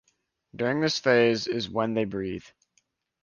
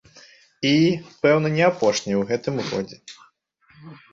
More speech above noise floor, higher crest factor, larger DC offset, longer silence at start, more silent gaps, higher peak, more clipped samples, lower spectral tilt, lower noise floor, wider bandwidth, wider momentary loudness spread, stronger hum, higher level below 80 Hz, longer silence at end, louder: first, 47 dB vs 39 dB; about the same, 18 dB vs 18 dB; neither; about the same, 0.55 s vs 0.6 s; neither; second, -8 dBFS vs -4 dBFS; neither; about the same, -5 dB/octave vs -5.5 dB/octave; first, -73 dBFS vs -59 dBFS; about the same, 7.2 kHz vs 7.8 kHz; about the same, 12 LU vs 10 LU; neither; about the same, -60 dBFS vs -60 dBFS; first, 0.75 s vs 0.2 s; second, -26 LUFS vs -21 LUFS